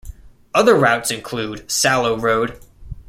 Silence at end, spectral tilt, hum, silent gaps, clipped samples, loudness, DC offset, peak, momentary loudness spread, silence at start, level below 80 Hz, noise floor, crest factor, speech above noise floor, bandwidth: 0.05 s; -3.5 dB/octave; none; none; under 0.1%; -17 LUFS; under 0.1%; -2 dBFS; 12 LU; 0.05 s; -42 dBFS; -38 dBFS; 18 dB; 20 dB; 16.5 kHz